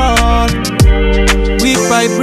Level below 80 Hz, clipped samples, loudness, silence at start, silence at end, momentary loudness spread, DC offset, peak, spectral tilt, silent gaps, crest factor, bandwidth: -14 dBFS; under 0.1%; -11 LUFS; 0 s; 0 s; 2 LU; under 0.1%; 0 dBFS; -4.5 dB/octave; none; 10 dB; 15 kHz